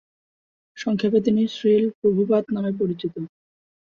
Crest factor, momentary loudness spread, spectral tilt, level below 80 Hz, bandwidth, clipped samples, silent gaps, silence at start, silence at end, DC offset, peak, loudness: 16 dB; 11 LU; -7.5 dB/octave; -64 dBFS; 7 kHz; under 0.1%; 1.95-2.02 s; 0.75 s; 0.6 s; under 0.1%; -8 dBFS; -22 LUFS